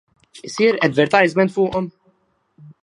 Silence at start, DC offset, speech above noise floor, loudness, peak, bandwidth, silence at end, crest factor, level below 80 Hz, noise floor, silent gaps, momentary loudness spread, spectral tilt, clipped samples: 0.35 s; under 0.1%; 46 dB; -17 LUFS; 0 dBFS; 11 kHz; 0.1 s; 20 dB; -56 dBFS; -63 dBFS; none; 17 LU; -5.5 dB/octave; under 0.1%